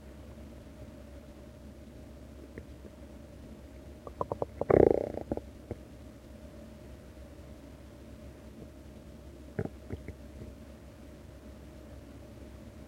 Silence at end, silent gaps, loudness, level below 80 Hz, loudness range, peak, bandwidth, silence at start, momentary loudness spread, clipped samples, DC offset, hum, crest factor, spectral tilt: 0 s; none; -32 LUFS; -52 dBFS; 18 LU; -8 dBFS; 16 kHz; 0 s; 14 LU; under 0.1%; under 0.1%; none; 30 dB; -8 dB/octave